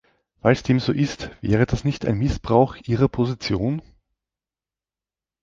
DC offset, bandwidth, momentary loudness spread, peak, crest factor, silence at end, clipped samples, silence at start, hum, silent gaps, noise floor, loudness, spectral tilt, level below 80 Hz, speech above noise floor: under 0.1%; 7.6 kHz; 6 LU; -2 dBFS; 20 dB; 1.6 s; under 0.1%; 0.45 s; none; none; under -90 dBFS; -22 LUFS; -7 dB/octave; -40 dBFS; over 69 dB